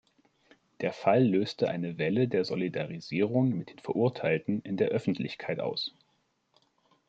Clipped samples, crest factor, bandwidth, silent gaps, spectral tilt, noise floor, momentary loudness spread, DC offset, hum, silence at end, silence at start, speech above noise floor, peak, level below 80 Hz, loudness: under 0.1%; 20 dB; 8 kHz; none; -7.5 dB/octave; -74 dBFS; 9 LU; under 0.1%; none; 1.2 s; 0.8 s; 45 dB; -10 dBFS; -72 dBFS; -30 LUFS